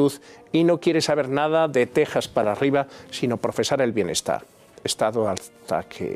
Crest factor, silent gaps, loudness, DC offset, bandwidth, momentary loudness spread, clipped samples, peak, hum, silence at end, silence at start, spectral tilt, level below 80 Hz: 16 dB; none; -23 LUFS; under 0.1%; 15.5 kHz; 8 LU; under 0.1%; -6 dBFS; none; 0 s; 0 s; -4.5 dB/octave; -60 dBFS